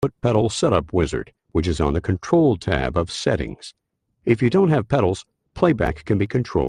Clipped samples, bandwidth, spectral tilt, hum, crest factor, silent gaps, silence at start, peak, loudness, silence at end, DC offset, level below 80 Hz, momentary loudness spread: under 0.1%; 11 kHz; -6.5 dB/octave; none; 18 dB; none; 0 s; -2 dBFS; -21 LUFS; 0 s; under 0.1%; -38 dBFS; 9 LU